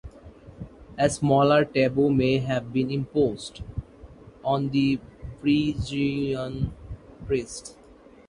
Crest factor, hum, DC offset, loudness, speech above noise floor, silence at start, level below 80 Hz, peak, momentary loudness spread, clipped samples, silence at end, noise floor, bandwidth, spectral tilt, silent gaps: 18 dB; none; under 0.1%; -25 LUFS; 27 dB; 0.05 s; -46 dBFS; -6 dBFS; 20 LU; under 0.1%; 0.55 s; -51 dBFS; 11.5 kHz; -6.5 dB/octave; none